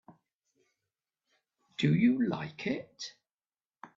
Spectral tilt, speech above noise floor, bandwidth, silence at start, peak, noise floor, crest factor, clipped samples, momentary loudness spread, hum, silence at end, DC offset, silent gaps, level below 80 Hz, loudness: -6.5 dB/octave; over 60 dB; 7.6 kHz; 0.1 s; -14 dBFS; under -90 dBFS; 20 dB; under 0.1%; 18 LU; none; 0.1 s; under 0.1%; 0.35-0.40 s; -72 dBFS; -30 LUFS